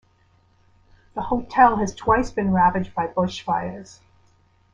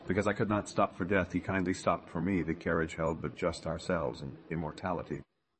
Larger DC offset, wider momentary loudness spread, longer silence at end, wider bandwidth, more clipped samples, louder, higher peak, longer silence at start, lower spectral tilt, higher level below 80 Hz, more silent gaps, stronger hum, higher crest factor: neither; first, 16 LU vs 8 LU; first, 0.9 s vs 0.35 s; second, 7.8 kHz vs 8.8 kHz; neither; first, -21 LUFS vs -33 LUFS; first, -2 dBFS vs -14 dBFS; first, 1.15 s vs 0 s; about the same, -6 dB/octave vs -6.5 dB/octave; first, -44 dBFS vs -58 dBFS; neither; neither; about the same, 20 dB vs 20 dB